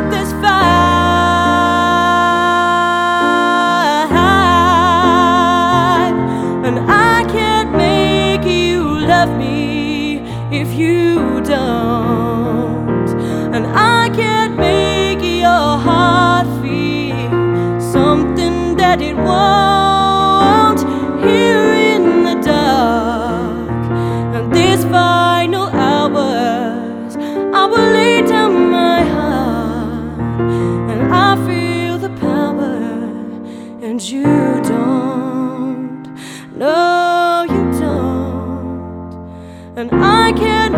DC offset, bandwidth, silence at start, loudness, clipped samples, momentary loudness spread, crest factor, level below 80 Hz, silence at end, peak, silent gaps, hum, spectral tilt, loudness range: under 0.1%; 16.5 kHz; 0 s; -13 LUFS; under 0.1%; 10 LU; 12 dB; -34 dBFS; 0 s; 0 dBFS; none; none; -5.5 dB/octave; 5 LU